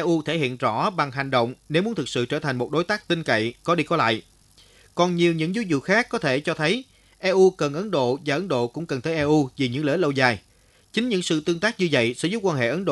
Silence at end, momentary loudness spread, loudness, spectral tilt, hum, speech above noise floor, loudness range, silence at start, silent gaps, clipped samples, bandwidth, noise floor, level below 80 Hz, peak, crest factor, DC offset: 0 s; 5 LU; -23 LUFS; -5.5 dB/octave; none; 32 dB; 2 LU; 0 s; none; under 0.1%; 12 kHz; -54 dBFS; -60 dBFS; -4 dBFS; 20 dB; under 0.1%